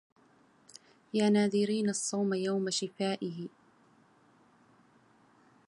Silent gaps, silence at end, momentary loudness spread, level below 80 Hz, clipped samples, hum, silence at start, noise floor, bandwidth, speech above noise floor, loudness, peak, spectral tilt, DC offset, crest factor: none; 2.2 s; 11 LU; -80 dBFS; under 0.1%; none; 1.15 s; -64 dBFS; 11.5 kHz; 34 dB; -31 LUFS; -16 dBFS; -4.5 dB/octave; under 0.1%; 18 dB